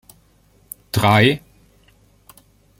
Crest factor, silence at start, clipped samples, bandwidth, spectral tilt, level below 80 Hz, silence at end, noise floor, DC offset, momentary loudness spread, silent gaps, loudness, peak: 20 dB; 0.95 s; under 0.1%; 16.5 kHz; -5.5 dB/octave; -50 dBFS; 1.45 s; -56 dBFS; under 0.1%; 25 LU; none; -17 LUFS; -2 dBFS